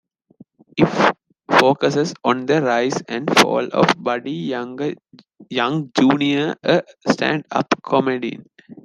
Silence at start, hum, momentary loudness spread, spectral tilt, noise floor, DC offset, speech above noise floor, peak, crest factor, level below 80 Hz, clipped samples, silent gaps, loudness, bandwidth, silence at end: 0.75 s; none; 11 LU; -5 dB/octave; -50 dBFS; under 0.1%; 31 dB; 0 dBFS; 20 dB; -60 dBFS; under 0.1%; none; -19 LUFS; 13.5 kHz; 0.1 s